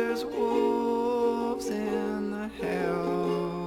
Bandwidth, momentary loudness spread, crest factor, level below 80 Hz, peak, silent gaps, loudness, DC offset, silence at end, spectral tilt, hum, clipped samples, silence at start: 17.5 kHz; 5 LU; 16 dB; -56 dBFS; -12 dBFS; none; -29 LUFS; under 0.1%; 0 s; -6.5 dB/octave; 60 Hz at -60 dBFS; under 0.1%; 0 s